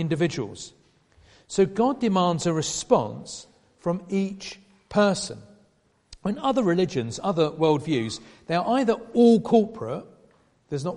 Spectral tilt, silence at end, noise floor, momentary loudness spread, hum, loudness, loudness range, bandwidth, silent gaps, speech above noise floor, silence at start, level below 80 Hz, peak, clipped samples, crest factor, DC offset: -5.5 dB/octave; 0 s; -64 dBFS; 15 LU; none; -24 LUFS; 4 LU; 11.5 kHz; none; 41 dB; 0 s; -58 dBFS; -4 dBFS; under 0.1%; 20 dB; under 0.1%